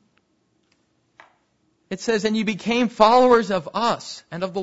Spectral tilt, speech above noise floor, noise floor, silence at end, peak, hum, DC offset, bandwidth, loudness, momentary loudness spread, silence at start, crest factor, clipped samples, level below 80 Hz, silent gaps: -5 dB/octave; 47 dB; -67 dBFS; 0 s; 0 dBFS; none; under 0.1%; 8 kHz; -20 LUFS; 14 LU; 1.9 s; 22 dB; under 0.1%; -60 dBFS; none